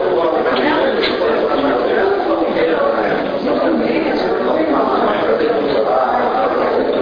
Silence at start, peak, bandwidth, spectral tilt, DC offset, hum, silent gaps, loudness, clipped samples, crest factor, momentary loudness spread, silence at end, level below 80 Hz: 0 s; -4 dBFS; 5.2 kHz; -7 dB/octave; under 0.1%; none; none; -15 LUFS; under 0.1%; 12 dB; 2 LU; 0 s; -46 dBFS